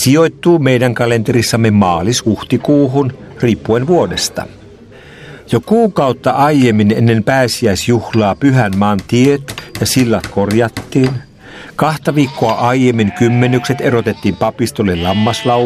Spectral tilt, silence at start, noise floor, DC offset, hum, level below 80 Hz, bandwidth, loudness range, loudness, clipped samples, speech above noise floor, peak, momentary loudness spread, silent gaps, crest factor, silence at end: -5.5 dB/octave; 0 s; -37 dBFS; under 0.1%; none; -44 dBFS; 15.5 kHz; 3 LU; -13 LUFS; under 0.1%; 25 dB; 0 dBFS; 6 LU; none; 12 dB; 0 s